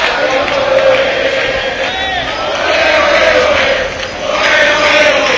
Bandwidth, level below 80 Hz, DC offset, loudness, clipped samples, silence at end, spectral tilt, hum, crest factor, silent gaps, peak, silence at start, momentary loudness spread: 8 kHz; -36 dBFS; under 0.1%; -10 LUFS; 0.2%; 0 s; -2.5 dB/octave; none; 12 dB; none; 0 dBFS; 0 s; 7 LU